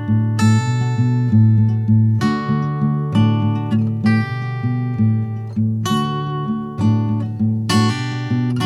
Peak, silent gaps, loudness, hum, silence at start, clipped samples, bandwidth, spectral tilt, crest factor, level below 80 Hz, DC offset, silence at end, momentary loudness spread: -4 dBFS; none; -18 LUFS; none; 0 s; under 0.1%; 11.5 kHz; -7 dB/octave; 12 dB; -52 dBFS; under 0.1%; 0 s; 7 LU